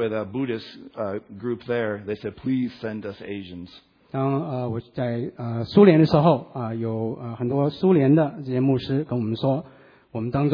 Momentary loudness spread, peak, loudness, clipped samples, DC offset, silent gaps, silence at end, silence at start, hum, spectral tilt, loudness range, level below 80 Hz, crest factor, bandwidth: 16 LU; -2 dBFS; -23 LUFS; under 0.1%; under 0.1%; none; 0 s; 0 s; none; -10 dB/octave; 9 LU; -56 dBFS; 20 dB; 5.4 kHz